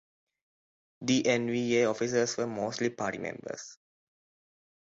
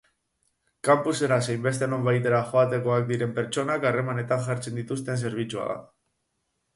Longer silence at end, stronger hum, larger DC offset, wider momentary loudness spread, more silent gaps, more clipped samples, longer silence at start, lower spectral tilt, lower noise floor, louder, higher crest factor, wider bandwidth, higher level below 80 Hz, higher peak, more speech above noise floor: first, 1.1 s vs 0.9 s; neither; neither; first, 14 LU vs 8 LU; neither; neither; first, 1 s vs 0.85 s; second, -4 dB/octave vs -6 dB/octave; first, under -90 dBFS vs -77 dBFS; second, -30 LUFS vs -26 LUFS; about the same, 18 dB vs 18 dB; second, 8 kHz vs 11.5 kHz; second, -72 dBFS vs -66 dBFS; second, -14 dBFS vs -8 dBFS; first, over 60 dB vs 52 dB